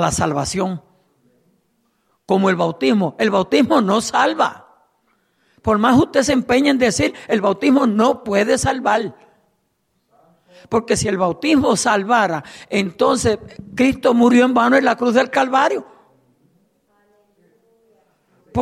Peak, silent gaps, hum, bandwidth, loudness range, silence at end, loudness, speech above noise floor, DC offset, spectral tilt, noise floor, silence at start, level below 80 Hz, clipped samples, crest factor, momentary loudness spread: -2 dBFS; none; none; 14 kHz; 5 LU; 0 s; -17 LUFS; 51 dB; under 0.1%; -4.5 dB/octave; -68 dBFS; 0 s; -48 dBFS; under 0.1%; 16 dB; 8 LU